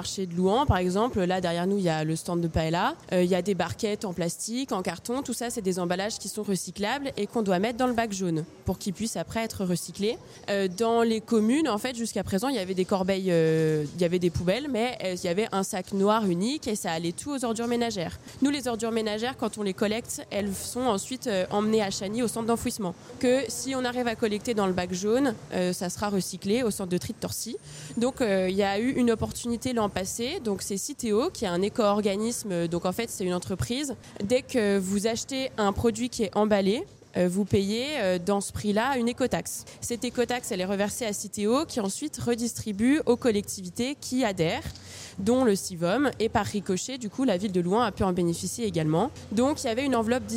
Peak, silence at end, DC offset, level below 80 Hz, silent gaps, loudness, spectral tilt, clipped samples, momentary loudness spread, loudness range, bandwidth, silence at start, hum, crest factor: -10 dBFS; 0 s; under 0.1%; -52 dBFS; none; -27 LUFS; -5 dB/octave; under 0.1%; 6 LU; 3 LU; 16.5 kHz; 0 s; none; 18 dB